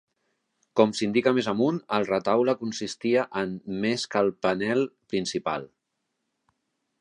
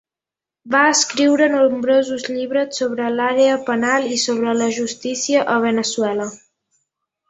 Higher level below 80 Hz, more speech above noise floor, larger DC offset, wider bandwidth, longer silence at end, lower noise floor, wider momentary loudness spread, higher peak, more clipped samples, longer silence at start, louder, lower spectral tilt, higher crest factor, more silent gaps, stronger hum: about the same, -66 dBFS vs -66 dBFS; second, 54 dB vs 71 dB; neither; first, 10.5 kHz vs 8.4 kHz; first, 1.35 s vs 0.95 s; second, -80 dBFS vs -88 dBFS; about the same, 7 LU vs 8 LU; second, -6 dBFS vs -2 dBFS; neither; about the same, 0.75 s vs 0.65 s; second, -26 LUFS vs -17 LUFS; first, -5 dB/octave vs -2.5 dB/octave; about the same, 20 dB vs 16 dB; neither; neither